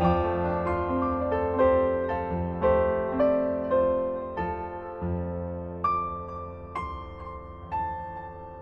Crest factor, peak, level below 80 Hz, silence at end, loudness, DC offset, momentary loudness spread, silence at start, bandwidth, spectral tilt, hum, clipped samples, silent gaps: 16 dB; -12 dBFS; -42 dBFS; 0 s; -28 LUFS; under 0.1%; 14 LU; 0 s; 5.2 kHz; -9.5 dB/octave; none; under 0.1%; none